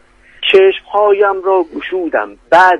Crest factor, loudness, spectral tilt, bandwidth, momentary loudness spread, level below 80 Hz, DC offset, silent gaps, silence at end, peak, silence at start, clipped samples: 12 dB; -12 LUFS; -4 dB/octave; 8.2 kHz; 10 LU; -52 dBFS; under 0.1%; none; 0 s; 0 dBFS; 0.4 s; 0.1%